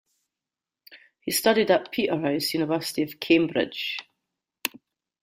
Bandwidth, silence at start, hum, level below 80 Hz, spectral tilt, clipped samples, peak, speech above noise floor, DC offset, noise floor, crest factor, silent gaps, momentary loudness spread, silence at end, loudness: 16 kHz; 0.9 s; none; -68 dBFS; -4 dB/octave; under 0.1%; -4 dBFS; 65 dB; under 0.1%; -89 dBFS; 22 dB; none; 11 LU; 0.45 s; -25 LUFS